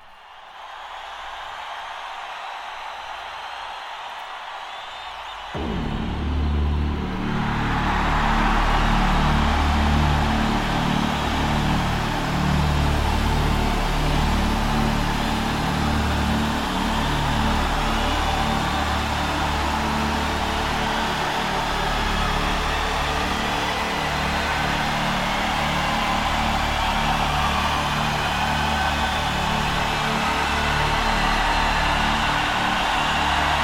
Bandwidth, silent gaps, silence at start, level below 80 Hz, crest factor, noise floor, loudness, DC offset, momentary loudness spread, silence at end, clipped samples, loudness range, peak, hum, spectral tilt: 16.5 kHz; none; 0 s; -28 dBFS; 14 dB; -43 dBFS; -22 LUFS; under 0.1%; 12 LU; 0 s; under 0.1%; 10 LU; -8 dBFS; none; -4.5 dB/octave